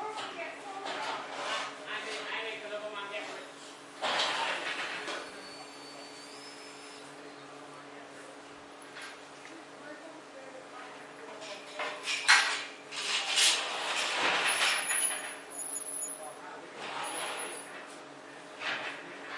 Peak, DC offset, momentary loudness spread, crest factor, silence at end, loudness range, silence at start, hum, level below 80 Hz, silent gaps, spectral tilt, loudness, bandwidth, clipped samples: -10 dBFS; under 0.1%; 21 LU; 26 dB; 0 s; 19 LU; 0 s; none; -86 dBFS; none; 0.5 dB/octave; -31 LUFS; 11.5 kHz; under 0.1%